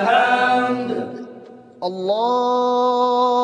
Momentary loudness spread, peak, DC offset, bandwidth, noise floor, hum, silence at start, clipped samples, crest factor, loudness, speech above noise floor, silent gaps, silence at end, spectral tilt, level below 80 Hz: 14 LU; -4 dBFS; under 0.1%; 10 kHz; -41 dBFS; none; 0 s; under 0.1%; 16 dB; -19 LUFS; 23 dB; none; 0 s; -5 dB/octave; -74 dBFS